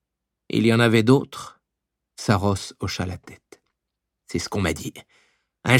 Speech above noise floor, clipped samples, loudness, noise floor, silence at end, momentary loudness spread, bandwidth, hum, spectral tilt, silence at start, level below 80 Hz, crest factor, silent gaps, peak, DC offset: 61 dB; under 0.1%; -22 LUFS; -83 dBFS; 0 s; 19 LU; 16 kHz; none; -5.5 dB/octave; 0.5 s; -50 dBFS; 22 dB; none; -2 dBFS; under 0.1%